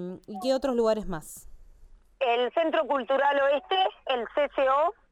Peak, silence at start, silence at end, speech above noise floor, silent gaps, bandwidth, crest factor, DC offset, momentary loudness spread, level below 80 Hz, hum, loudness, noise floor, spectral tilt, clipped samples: -14 dBFS; 0 s; 0.2 s; 26 dB; none; 15 kHz; 14 dB; under 0.1%; 12 LU; -52 dBFS; none; -26 LUFS; -53 dBFS; -4 dB/octave; under 0.1%